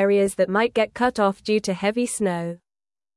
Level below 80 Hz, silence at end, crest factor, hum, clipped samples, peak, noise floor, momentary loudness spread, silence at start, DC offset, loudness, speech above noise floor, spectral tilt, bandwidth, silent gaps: -58 dBFS; 0.6 s; 16 dB; none; under 0.1%; -8 dBFS; under -90 dBFS; 7 LU; 0 s; under 0.1%; -22 LUFS; over 68 dB; -5 dB/octave; 12 kHz; none